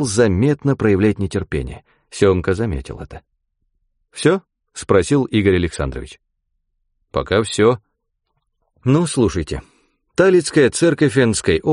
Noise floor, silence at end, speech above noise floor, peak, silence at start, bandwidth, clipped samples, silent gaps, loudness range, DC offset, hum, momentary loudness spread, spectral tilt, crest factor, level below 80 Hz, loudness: -71 dBFS; 0 s; 55 dB; -2 dBFS; 0 s; 11 kHz; under 0.1%; none; 5 LU; under 0.1%; none; 18 LU; -5.5 dB/octave; 16 dB; -38 dBFS; -17 LUFS